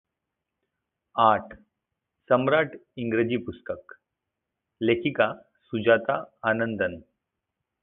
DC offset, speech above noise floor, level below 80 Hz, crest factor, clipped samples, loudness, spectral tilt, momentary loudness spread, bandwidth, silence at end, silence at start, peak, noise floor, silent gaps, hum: under 0.1%; 60 dB; -60 dBFS; 22 dB; under 0.1%; -25 LUFS; -10 dB/octave; 14 LU; 4 kHz; 0.85 s; 1.15 s; -6 dBFS; -84 dBFS; none; none